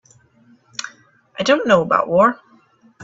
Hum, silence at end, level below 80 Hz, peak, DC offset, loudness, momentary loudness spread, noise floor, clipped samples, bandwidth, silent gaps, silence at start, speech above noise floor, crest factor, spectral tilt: none; 0 s; -60 dBFS; 0 dBFS; under 0.1%; -16 LUFS; 21 LU; -54 dBFS; under 0.1%; 7.8 kHz; none; 0.8 s; 38 dB; 20 dB; -4.5 dB/octave